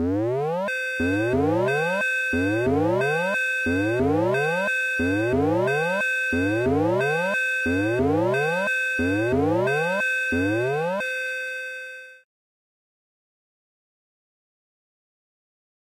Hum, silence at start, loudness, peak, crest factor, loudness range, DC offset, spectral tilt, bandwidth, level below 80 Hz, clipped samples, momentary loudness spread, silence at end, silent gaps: none; 0 s; -23 LUFS; -14 dBFS; 10 dB; 7 LU; under 0.1%; -6 dB/octave; 16.5 kHz; -54 dBFS; under 0.1%; 4 LU; 3.85 s; none